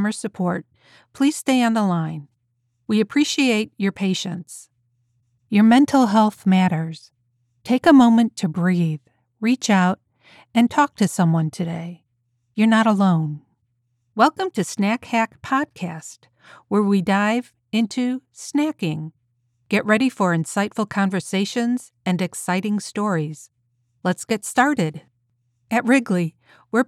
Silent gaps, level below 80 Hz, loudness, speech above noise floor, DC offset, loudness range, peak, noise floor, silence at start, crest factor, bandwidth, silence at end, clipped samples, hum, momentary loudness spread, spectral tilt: none; -66 dBFS; -20 LUFS; 50 dB; under 0.1%; 5 LU; -4 dBFS; -70 dBFS; 0 s; 18 dB; 13.5 kHz; 0.05 s; under 0.1%; none; 15 LU; -5.5 dB/octave